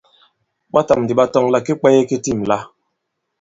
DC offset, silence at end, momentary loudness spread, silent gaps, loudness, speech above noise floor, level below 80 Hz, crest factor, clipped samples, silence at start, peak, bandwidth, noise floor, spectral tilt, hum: under 0.1%; 0.75 s; 6 LU; none; -16 LUFS; 59 dB; -52 dBFS; 18 dB; under 0.1%; 0.75 s; 0 dBFS; 7.8 kHz; -74 dBFS; -6 dB/octave; none